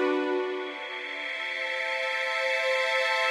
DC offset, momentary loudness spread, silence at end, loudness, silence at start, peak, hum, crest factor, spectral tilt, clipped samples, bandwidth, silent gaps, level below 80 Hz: under 0.1%; 9 LU; 0 s; -28 LUFS; 0 s; -14 dBFS; none; 14 dB; 0 dB/octave; under 0.1%; 13 kHz; none; under -90 dBFS